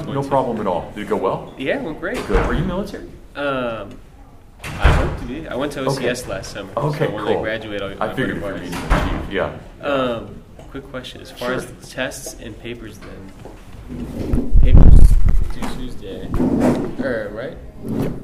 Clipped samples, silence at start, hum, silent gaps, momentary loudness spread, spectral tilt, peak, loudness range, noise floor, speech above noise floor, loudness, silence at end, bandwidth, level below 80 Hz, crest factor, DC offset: 0.2%; 0 s; none; none; 17 LU; -6.5 dB/octave; 0 dBFS; 10 LU; -42 dBFS; 24 dB; -21 LUFS; 0 s; 12.5 kHz; -20 dBFS; 18 dB; under 0.1%